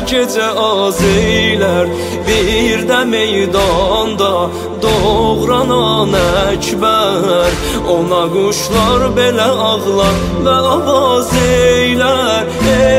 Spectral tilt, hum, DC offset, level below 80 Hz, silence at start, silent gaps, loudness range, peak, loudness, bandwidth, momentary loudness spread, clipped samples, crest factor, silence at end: -4.5 dB/octave; none; under 0.1%; -28 dBFS; 0 s; none; 1 LU; 0 dBFS; -12 LUFS; 16 kHz; 3 LU; under 0.1%; 12 dB; 0 s